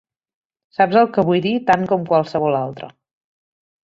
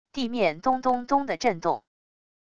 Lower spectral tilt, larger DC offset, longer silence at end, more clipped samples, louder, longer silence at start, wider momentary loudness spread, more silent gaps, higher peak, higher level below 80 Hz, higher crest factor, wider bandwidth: first, -7.5 dB/octave vs -5 dB/octave; second, under 0.1% vs 0.6%; first, 0.95 s vs 0.7 s; neither; first, -17 LUFS vs -26 LUFS; first, 0.8 s vs 0.05 s; first, 15 LU vs 6 LU; neither; first, -2 dBFS vs -10 dBFS; about the same, -58 dBFS vs -58 dBFS; about the same, 18 dB vs 18 dB; about the same, 7.6 kHz vs 8.2 kHz